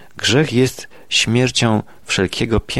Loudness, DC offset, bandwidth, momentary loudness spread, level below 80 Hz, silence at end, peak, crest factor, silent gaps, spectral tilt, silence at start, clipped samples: -17 LUFS; 0.9%; 13.5 kHz; 6 LU; -38 dBFS; 0 s; -2 dBFS; 14 dB; none; -4 dB/octave; 0.15 s; under 0.1%